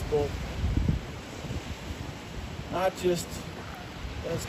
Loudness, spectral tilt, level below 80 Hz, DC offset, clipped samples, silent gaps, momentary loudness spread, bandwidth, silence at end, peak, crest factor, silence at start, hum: -33 LUFS; -5.5 dB/octave; -40 dBFS; under 0.1%; under 0.1%; none; 11 LU; 15.5 kHz; 0 s; -14 dBFS; 18 dB; 0 s; none